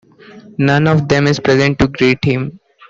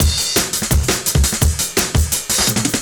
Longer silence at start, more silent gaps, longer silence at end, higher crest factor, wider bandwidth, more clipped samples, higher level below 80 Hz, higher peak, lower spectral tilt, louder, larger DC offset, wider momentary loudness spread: first, 0.35 s vs 0 s; neither; first, 0.35 s vs 0 s; about the same, 12 dB vs 16 dB; second, 7.6 kHz vs over 20 kHz; neither; second, -38 dBFS vs -22 dBFS; about the same, -2 dBFS vs 0 dBFS; first, -6.5 dB/octave vs -3 dB/octave; first, -13 LUFS vs -16 LUFS; neither; first, 7 LU vs 2 LU